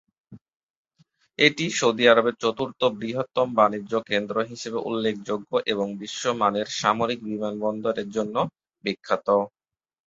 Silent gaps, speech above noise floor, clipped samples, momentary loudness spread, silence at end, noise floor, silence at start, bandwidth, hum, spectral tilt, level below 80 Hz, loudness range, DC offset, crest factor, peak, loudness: 0.41-0.45 s, 0.56-0.85 s; 40 dB; under 0.1%; 10 LU; 0.6 s; -64 dBFS; 0.3 s; 8 kHz; none; -4 dB/octave; -66 dBFS; 4 LU; under 0.1%; 22 dB; -2 dBFS; -24 LUFS